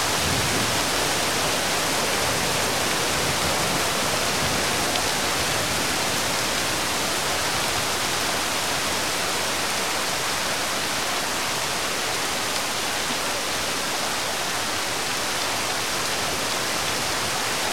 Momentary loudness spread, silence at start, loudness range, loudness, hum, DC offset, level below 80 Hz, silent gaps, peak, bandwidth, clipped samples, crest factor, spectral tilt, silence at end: 2 LU; 0 s; 2 LU; -22 LUFS; none; 1%; -48 dBFS; none; -6 dBFS; 16.5 kHz; under 0.1%; 18 dB; -1.5 dB/octave; 0 s